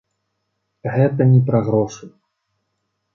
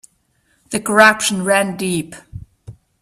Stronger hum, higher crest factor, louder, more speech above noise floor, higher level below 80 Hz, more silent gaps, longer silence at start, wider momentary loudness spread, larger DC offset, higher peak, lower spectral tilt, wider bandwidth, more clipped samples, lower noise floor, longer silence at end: neither; about the same, 18 dB vs 18 dB; about the same, -17 LUFS vs -15 LUFS; first, 57 dB vs 46 dB; second, -56 dBFS vs -50 dBFS; neither; first, 0.85 s vs 0.7 s; second, 15 LU vs 22 LU; neither; about the same, -2 dBFS vs 0 dBFS; first, -9 dB/octave vs -3.5 dB/octave; second, 7 kHz vs 15.5 kHz; neither; first, -73 dBFS vs -62 dBFS; first, 1.05 s vs 0.3 s